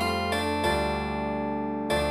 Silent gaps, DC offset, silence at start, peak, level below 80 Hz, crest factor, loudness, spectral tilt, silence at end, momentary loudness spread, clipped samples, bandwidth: none; under 0.1%; 0 s; -12 dBFS; -42 dBFS; 14 dB; -28 LUFS; -5 dB/octave; 0 s; 4 LU; under 0.1%; 15.5 kHz